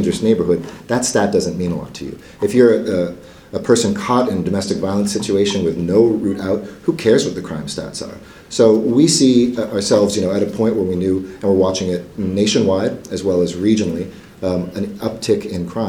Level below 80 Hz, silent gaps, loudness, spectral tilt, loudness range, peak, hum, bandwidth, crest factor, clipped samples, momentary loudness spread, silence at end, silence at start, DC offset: -48 dBFS; none; -17 LUFS; -5 dB/octave; 3 LU; 0 dBFS; none; 17 kHz; 16 dB; under 0.1%; 12 LU; 0 s; 0 s; under 0.1%